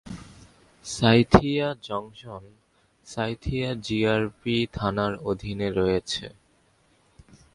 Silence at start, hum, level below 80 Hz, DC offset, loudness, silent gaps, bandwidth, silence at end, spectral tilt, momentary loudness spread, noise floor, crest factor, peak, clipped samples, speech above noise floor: 0.05 s; none; -44 dBFS; under 0.1%; -25 LUFS; none; 11.5 kHz; 1.25 s; -6 dB/octave; 22 LU; -63 dBFS; 26 dB; 0 dBFS; under 0.1%; 39 dB